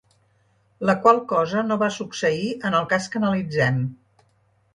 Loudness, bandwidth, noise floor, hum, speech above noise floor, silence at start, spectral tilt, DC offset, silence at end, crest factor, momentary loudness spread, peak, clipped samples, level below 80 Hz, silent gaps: -22 LUFS; 11.5 kHz; -63 dBFS; none; 42 dB; 0.8 s; -6 dB/octave; under 0.1%; 0.8 s; 22 dB; 8 LU; -2 dBFS; under 0.1%; -60 dBFS; none